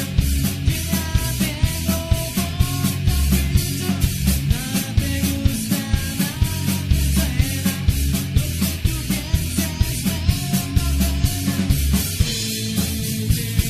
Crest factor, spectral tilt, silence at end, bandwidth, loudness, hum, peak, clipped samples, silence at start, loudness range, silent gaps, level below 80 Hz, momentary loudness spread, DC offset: 16 dB; -4.5 dB/octave; 0 s; 15 kHz; -21 LUFS; none; -4 dBFS; under 0.1%; 0 s; 1 LU; none; -24 dBFS; 3 LU; under 0.1%